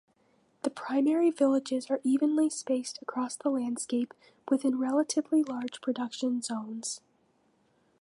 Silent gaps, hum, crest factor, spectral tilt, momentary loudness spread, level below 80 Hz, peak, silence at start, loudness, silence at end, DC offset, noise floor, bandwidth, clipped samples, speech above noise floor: none; none; 16 dB; -3.5 dB/octave; 10 LU; -84 dBFS; -14 dBFS; 0.65 s; -30 LUFS; 1.05 s; under 0.1%; -69 dBFS; 11.5 kHz; under 0.1%; 40 dB